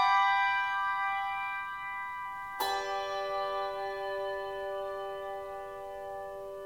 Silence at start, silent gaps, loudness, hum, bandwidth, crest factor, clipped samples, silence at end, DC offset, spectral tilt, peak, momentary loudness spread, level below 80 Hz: 0 s; none; -33 LUFS; none; 19 kHz; 18 dB; under 0.1%; 0 s; under 0.1%; -2 dB/octave; -16 dBFS; 13 LU; -66 dBFS